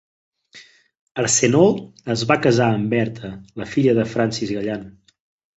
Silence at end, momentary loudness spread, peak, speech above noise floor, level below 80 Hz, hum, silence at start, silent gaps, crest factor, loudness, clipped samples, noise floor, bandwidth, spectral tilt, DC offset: 0.65 s; 16 LU; -2 dBFS; 29 dB; -54 dBFS; none; 0.55 s; 0.99-1.07 s; 18 dB; -19 LUFS; under 0.1%; -48 dBFS; 8.4 kHz; -4.5 dB/octave; under 0.1%